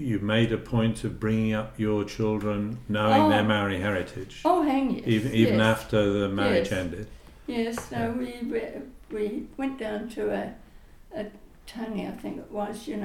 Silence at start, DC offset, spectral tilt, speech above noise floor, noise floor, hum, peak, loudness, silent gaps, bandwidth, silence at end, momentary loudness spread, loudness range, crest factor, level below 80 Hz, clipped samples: 0 s; under 0.1%; -6.5 dB/octave; 23 dB; -49 dBFS; none; -6 dBFS; -27 LUFS; none; 15.5 kHz; 0 s; 15 LU; 10 LU; 20 dB; -48 dBFS; under 0.1%